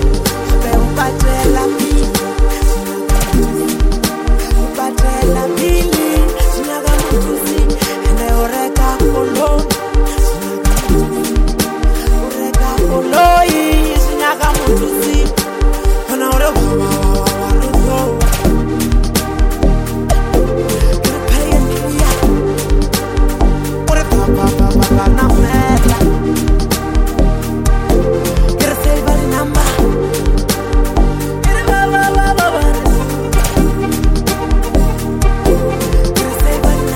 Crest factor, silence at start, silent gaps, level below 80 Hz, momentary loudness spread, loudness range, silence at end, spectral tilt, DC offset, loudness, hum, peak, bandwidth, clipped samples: 12 dB; 0 s; none; -14 dBFS; 4 LU; 2 LU; 0 s; -5 dB/octave; under 0.1%; -14 LUFS; none; 0 dBFS; 17 kHz; under 0.1%